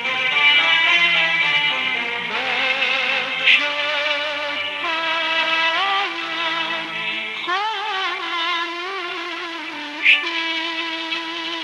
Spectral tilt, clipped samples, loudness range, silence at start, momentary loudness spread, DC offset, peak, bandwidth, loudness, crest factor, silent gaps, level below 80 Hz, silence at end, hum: -1.5 dB/octave; under 0.1%; 6 LU; 0 s; 11 LU; under 0.1%; -4 dBFS; 13 kHz; -18 LUFS; 18 dB; none; -78 dBFS; 0 s; none